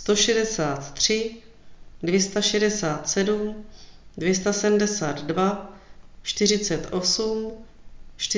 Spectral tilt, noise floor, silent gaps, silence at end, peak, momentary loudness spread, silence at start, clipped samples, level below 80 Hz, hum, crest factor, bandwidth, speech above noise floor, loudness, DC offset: -3 dB/octave; -44 dBFS; none; 0 s; -6 dBFS; 12 LU; 0 s; under 0.1%; -50 dBFS; none; 18 dB; 7.8 kHz; 21 dB; -23 LUFS; under 0.1%